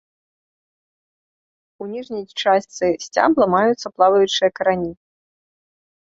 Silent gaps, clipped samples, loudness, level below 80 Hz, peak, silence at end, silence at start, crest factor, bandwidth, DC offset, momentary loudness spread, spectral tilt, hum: none; under 0.1%; -18 LUFS; -60 dBFS; -2 dBFS; 1.1 s; 1.8 s; 20 dB; 8 kHz; under 0.1%; 14 LU; -4.5 dB/octave; none